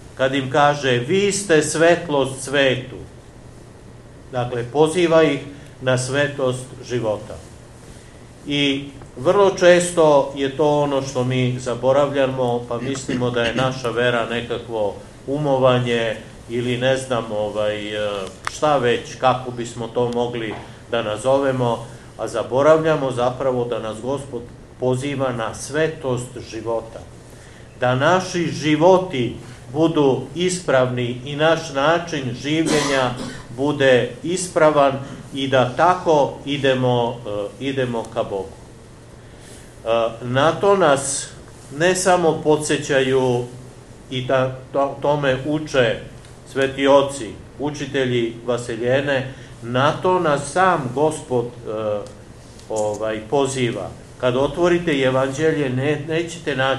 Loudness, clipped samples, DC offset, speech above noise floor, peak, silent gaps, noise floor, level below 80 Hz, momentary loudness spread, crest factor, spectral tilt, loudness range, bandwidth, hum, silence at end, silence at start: -20 LUFS; under 0.1%; under 0.1%; 22 dB; 0 dBFS; none; -41 dBFS; -48 dBFS; 13 LU; 20 dB; -5 dB/octave; 5 LU; 12.5 kHz; none; 0 s; 0 s